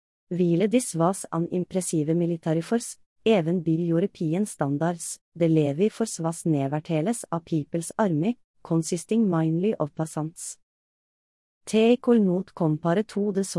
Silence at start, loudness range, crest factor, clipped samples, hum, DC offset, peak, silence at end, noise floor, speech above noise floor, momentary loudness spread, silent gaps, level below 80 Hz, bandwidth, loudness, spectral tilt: 0.3 s; 2 LU; 16 dB; under 0.1%; none; under 0.1%; -8 dBFS; 0 s; under -90 dBFS; over 66 dB; 9 LU; 3.06-3.16 s, 5.21-5.32 s, 8.44-8.54 s, 10.63-11.61 s; -68 dBFS; 12 kHz; -25 LUFS; -6.5 dB/octave